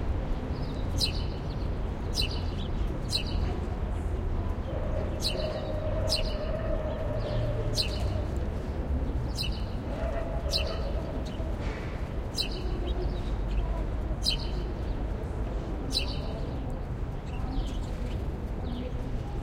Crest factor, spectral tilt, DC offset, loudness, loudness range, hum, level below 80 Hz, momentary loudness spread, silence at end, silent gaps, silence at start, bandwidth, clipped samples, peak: 18 dB; -5.5 dB/octave; under 0.1%; -32 LUFS; 3 LU; none; -34 dBFS; 6 LU; 0 s; none; 0 s; 16 kHz; under 0.1%; -12 dBFS